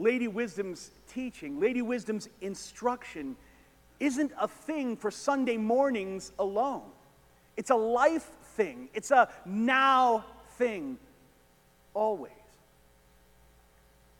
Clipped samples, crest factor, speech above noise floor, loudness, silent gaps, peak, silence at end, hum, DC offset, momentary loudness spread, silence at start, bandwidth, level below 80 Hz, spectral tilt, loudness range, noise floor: under 0.1%; 22 dB; 33 dB; -30 LUFS; none; -10 dBFS; 1.85 s; none; under 0.1%; 16 LU; 0 s; 17.5 kHz; -66 dBFS; -4.5 dB/octave; 8 LU; -63 dBFS